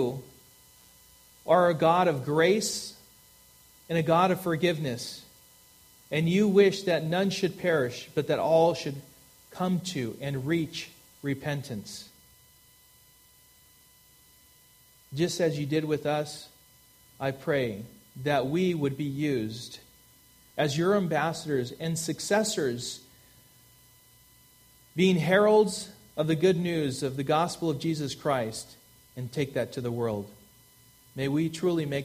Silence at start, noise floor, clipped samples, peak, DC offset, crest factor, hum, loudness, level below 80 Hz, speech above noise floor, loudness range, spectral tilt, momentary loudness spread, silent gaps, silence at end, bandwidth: 0 s; -59 dBFS; under 0.1%; -8 dBFS; under 0.1%; 20 dB; none; -28 LUFS; -64 dBFS; 32 dB; 8 LU; -5.5 dB/octave; 17 LU; none; 0 s; 15.5 kHz